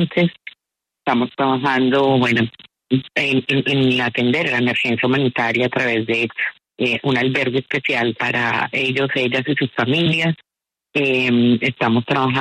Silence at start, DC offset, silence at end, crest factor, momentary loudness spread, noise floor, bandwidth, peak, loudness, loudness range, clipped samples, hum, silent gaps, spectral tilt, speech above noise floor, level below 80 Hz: 0 s; under 0.1%; 0 s; 14 dB; 6 LU; -84 dBFS; 9.4 kHz; -4 dBFS; -18 LUFS; 2 LU; under 0.1%; none; none; -6.5 dB/octave; 66 dB; -58 dBFS